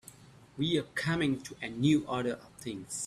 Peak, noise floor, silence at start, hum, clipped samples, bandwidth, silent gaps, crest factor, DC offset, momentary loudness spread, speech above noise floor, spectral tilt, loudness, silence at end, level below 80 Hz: -14 dBFS; -55 dBFS; 0.05 s; none; under 0.1%; 14 kHz; none; 18 dB; under 0.1%; 13 LU; 23 dB; -5 dB/octave; -32 LUFS; 0 s; -62 dBFS